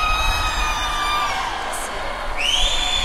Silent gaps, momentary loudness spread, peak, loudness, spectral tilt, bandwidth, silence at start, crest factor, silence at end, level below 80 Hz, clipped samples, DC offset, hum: none; 8 LU; -6 dBFS; -21 LUFS; -1.5 dB/octave; 15.5 kHz; 0 s; 16 dB; 0 s; -28 dBFS; under 0.1%; under 0.1%; none